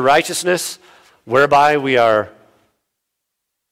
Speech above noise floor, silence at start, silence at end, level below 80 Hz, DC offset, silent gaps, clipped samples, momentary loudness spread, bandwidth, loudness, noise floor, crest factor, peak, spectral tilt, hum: 63 dB; 0 s; 1.4 s; -58 dBFS; under 0.1%; none; under 0.1%; 14 LU; 16.5 kHz; -15 LUFS; -77 dBFS; 16 dB; -2 dBFS; -3.5 dB/octave; none